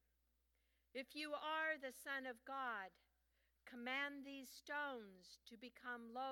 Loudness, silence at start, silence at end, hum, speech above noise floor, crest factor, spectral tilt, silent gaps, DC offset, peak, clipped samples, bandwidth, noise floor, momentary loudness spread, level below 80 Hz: -48 LUFS; 0.95 s; 0 s; none; 35 dB; 20 dB; -2 dB/octave; none; under 0.1%; -32 dBFS; under 0.1%; 19 kHz; -84 dBFS; 16 LU; -86 dBFS